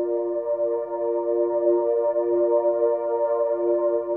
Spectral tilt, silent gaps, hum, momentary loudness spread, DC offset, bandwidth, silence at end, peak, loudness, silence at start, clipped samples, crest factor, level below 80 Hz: -10.5 dB/octave; none; none; 5 LU; under 0.1%; 2.5 kHz; 0 s; -10 dBFS; -23 LUFS; 0 s; under 0.1%; 12 dB; -76 dBFS